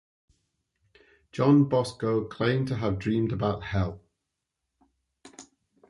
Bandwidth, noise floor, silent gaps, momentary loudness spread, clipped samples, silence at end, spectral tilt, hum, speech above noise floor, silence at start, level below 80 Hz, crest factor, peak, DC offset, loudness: 11.5 kHz; -83 dBFS; none; 9 LU; under 0.1%; 0.45 s; -7.5 dB/octave; none; 58 dB; 1.35 s; -50 dBFS; 18 dB; -10 dBFS; under 0.1%; -26 LUFS